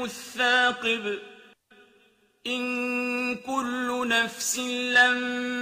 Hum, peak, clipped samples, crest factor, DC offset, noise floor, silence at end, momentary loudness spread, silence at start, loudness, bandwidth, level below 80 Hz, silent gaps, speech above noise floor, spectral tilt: none; -8 dBFS; under 0.1%; 20 dB; under 0.1%; -63 dBFS; 0 s; 11 LU; 0 s; -25 LUFS; 15.5 kHz; -70 dBFS; none; 37 dB; -1 dB/octave